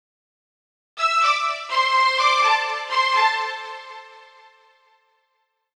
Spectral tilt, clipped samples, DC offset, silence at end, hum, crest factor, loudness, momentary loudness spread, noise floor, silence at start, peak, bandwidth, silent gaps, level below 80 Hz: 3 dB/octave; under 0.1%; under 0.1%; 1.55 s; none; 18 dB; -19 LUFS; 19 LU; -72 dBFS; 0.95 s; -6 dBFS; 12.5 kHz; none; -80 dBFS